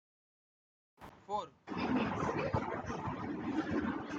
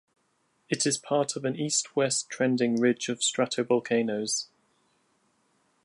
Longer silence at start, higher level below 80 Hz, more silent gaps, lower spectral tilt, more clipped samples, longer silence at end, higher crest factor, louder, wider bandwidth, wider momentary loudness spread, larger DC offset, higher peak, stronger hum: first, 1 s vs 0.7 s; first, -60 dBFS vs -78 dBFS; neither; first, -7 dB/octave vs -3.5 dB/octave; neither; second, 0 s vs 1.4 s; about the same, 18 dB vs 18 dB; second, -38 LUFS vs -27 LUFS; second, 7.8 kHz vs 11.5 kHz; first, 10 LU vs 5 LU; neither; second, -20 dBFS vs -12 dBFS; neither